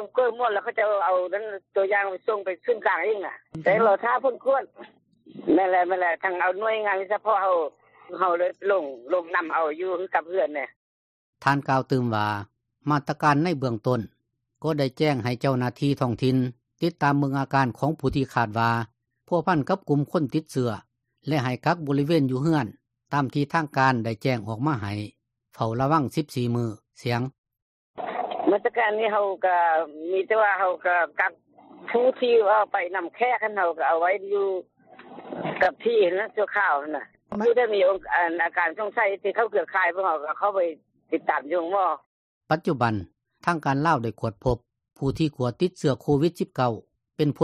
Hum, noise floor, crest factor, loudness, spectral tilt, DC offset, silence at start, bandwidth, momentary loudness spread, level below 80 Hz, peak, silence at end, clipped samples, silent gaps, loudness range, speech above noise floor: none; under -90 dBFS; 18 dB; -25 LUFS; -7 dB/octave; under 0.1%; 0 s; 13.5 kHz; 9 LU; -56 dBFS; -6 dBFS; 0 s; under 0.1%; 10.76-11.33 s, 27.38-27.44 s, 27.62-27.94 s, 42.06-42.41 s; 3 LU; over 66 dB